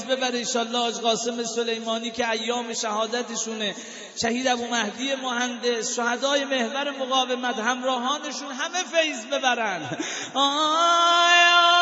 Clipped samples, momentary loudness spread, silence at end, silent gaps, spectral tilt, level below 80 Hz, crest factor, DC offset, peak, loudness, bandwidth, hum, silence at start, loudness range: under 0.1%; 10 LU; 0 s; none; -1 dB/octave; -72 dBFS; 20 dB; under 0.1%; -4 dBFS; -23 LUFS; 8 kHz; none; 0 s; 5 LU